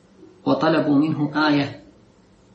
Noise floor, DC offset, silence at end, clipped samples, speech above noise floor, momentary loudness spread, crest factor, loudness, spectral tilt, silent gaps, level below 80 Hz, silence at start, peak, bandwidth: -53 dBFS; under 0.1%; 0.75 s; under 0.1%; 34 dB; 8 LU; 16 dB; -20 LUFS; -7.5 dB/octave; none; -62 dBFS; 0.45 s; -6 dBFS; 6.6 kHz